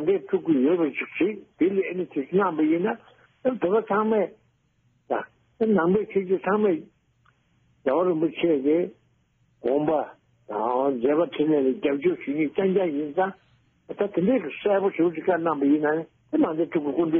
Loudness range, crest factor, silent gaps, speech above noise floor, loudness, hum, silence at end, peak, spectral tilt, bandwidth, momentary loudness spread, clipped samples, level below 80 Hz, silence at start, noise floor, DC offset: 2 LU; 14 dB; none; 43 dB; -24 LUFS; none; 0 s; -10 dBFS; -6 dB/octave; 3.6 kHz; 8 LU; under 0.1%; -66 dBFS; 0 s; -66 dBFS; under 0.1%